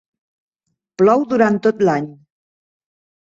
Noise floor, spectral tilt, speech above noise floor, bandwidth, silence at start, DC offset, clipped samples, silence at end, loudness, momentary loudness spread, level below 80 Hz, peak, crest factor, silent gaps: -75 dBFS; -7.5 dB/octave; 60 dB; 7.6 kHz; 1 s; under 0.1%; under 0.1%; 1.1 s; -16 LUFS; 7 LU; -62 dBFS; -2 dBFS; 18 dB; none